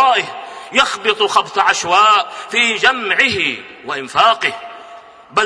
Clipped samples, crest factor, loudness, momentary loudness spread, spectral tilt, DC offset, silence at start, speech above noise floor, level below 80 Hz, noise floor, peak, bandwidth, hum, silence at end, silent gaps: under 0.1%; 16 dB; -14 LUFS; 14 LU; -1.5 dB/octave; under 0.1%; 0 s; 23 dB; -56 dBFS; -38 dBFS; 0 dBFS; 10.5 kHz; none; 0 s; none